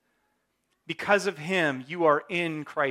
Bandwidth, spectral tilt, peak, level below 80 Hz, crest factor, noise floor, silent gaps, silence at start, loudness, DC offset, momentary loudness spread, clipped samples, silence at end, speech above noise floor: 14.5 kHz; -5 dB/octave; -8 dBFS; -74 dBFS; 20 dB; -75 dBFS; none; 0.9 s; -26 LUFS; under 0.1%; 7 LU; under 0.1%; 0 s; 49 dB